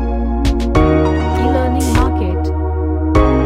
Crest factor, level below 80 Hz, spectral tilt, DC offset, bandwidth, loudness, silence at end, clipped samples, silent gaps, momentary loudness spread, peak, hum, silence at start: 12 dB; -18 dBFS; -7 dB/octave; under 0.1%; 14 kHz; -15 LUFS; 0 s; under 0.1%; none; 5 LU; 0 dBFS; none; 0 s